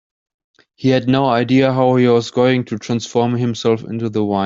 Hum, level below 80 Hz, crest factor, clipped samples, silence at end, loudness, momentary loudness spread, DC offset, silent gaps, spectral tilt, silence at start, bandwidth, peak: none; -56 dBFS; 14 dB; under 0.1%; 0 s; -16 LUFS; 7 LU; under 0.1%; none; -6.5 dB/octave; 0.8 s; 7.6 kHz; -2 dBFS